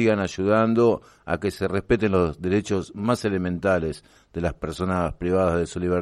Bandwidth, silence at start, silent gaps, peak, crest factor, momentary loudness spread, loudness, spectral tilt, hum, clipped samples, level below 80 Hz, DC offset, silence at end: 13 kHz; 0 s; none; -8 dBFS; 16 dB; 9 LU; -24 LUFS; -7 dB/octave; none; under 0.1%; -46 dBFS; under 0.1%; 0 s